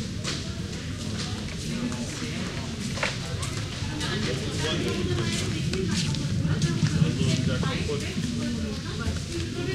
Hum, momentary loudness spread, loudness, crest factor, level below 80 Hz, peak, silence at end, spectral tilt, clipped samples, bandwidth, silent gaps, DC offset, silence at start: none; 7 LU; -28 LUFS; 18 dB; -42 dBFS; -10 dBFS; 0 s; -5 dB/octave; under 0.1%; 14 kHz; none; under 0.1%; 0 s